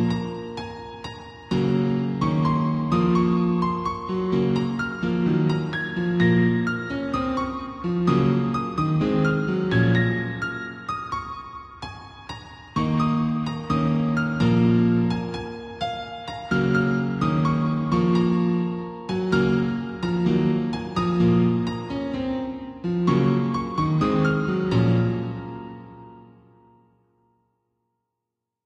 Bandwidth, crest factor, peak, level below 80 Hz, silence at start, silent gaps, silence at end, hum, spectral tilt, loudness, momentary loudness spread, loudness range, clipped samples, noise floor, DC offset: 8 kHz; 16 dB; -8 dBFS; -46 dBFS; 0 s; none; 2.45 s; none; -8 dB/octave; -23 LUFS; 14 LU; 4 LU; under 0.1%; -84 dBFS; under 0.1%